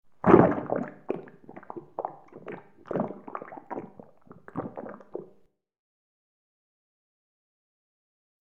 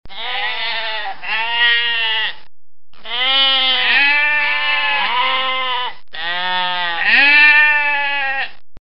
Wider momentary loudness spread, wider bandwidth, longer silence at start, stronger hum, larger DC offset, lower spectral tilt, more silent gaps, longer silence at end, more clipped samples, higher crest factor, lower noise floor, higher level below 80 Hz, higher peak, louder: first, 24 LU vs 14 LU; second, 3.8 kHz vs 8.8 kHz; first, 0.25 s vs 0.05 s; neither; second, 0.1% vs 5%; first, -10.5 dB/octave vs -3 dB/octave; neither; first, 3.15 s vs 0 s; neither; first, 28 dB vs 16 dB; about the same, -60 dBFS vs -59 dBFS; second, -60 dBFS vs -54 dBFS; about the same, -2 dBFS vs 0 dBFS; second, -27 LUFS vs -14 LUFS